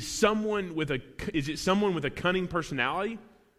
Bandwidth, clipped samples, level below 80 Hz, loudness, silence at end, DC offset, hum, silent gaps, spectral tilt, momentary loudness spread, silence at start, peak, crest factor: 15.5 kHz; under 0.1%; -52 dBFS; -29 LUFS; 0.35 s; under 0.1%; none; none; -4.5 dB/octave; 7 LU; 0 s; -10 dBFS; 20 dB